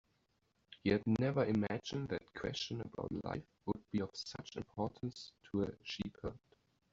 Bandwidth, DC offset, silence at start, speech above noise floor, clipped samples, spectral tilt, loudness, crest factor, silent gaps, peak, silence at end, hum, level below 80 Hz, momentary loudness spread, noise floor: 7.8 kHz; under 0.1%; 0.7 s; 40 dB; under 0.1%; -5.5 dB/octave; -40 LUFS; 22 dB; none; -18 dBFS; 0.55 s; none; -64 dBFS; 12 LU; -79 dBFS